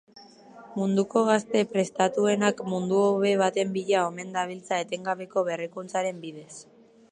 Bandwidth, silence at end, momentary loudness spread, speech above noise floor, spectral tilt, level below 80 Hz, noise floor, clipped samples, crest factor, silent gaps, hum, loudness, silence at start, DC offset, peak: 10.5 kHz; 0.5 s; 10 LU; 23 dB; -5 dB/octave; -74 dBFS; -49 dBFS; under 0.1%; 18 dB; none; none; -26 LUFS; 0.15 s; under 0.1%; -8 dBFS